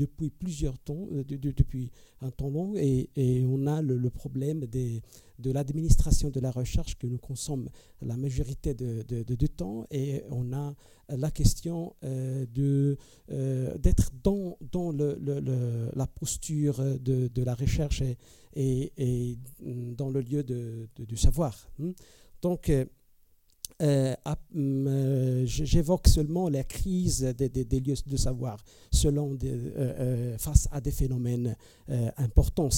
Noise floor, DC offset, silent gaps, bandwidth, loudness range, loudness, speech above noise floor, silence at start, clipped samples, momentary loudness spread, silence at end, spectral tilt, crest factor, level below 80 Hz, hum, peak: -62 dBFS; under 0.1%; none; 17 kHz; 5 LU; -30 LUFS; 34 dB; 0 s; under 0.1%; 11 LU; 0 s; -6.5 dB/octave; 22 dB; -34 dBFS; none; -6 dBFS